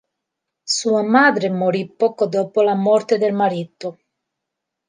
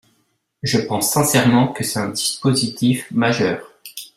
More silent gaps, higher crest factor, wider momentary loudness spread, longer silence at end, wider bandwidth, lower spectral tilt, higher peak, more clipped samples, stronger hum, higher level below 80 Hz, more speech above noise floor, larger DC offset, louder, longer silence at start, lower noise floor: neither; about the same, 18 dB vs 18 dB; first, 15 LU vs 11 LU; first, 0.95 s vs 0.1 s; second, 10 kHz vs 16 kHz; about the same, -4.5 dB/octave vs -4.5 dB/octave; about the same, -2 dBFS vs -2 dBFS; neither; neither; second, -72 dBFS vs -54 dBFS; first, 63 dB vs 48 dB; neither; about the same, -18 LUFS vs -18 LUFS; about the same, 0.65 s vs 0.65 s; first, -81 dBFS vs -66 dBFS